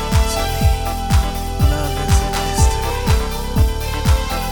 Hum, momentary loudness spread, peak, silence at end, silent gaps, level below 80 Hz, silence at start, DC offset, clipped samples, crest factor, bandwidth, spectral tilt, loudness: none; 4 LU; -2 dBFS; 0 s; none; -18 dBFS; 0 s; under 0.1%; under 0.1%; 14 dB; 20 kHz; -5 dB/octave; -18 LUFS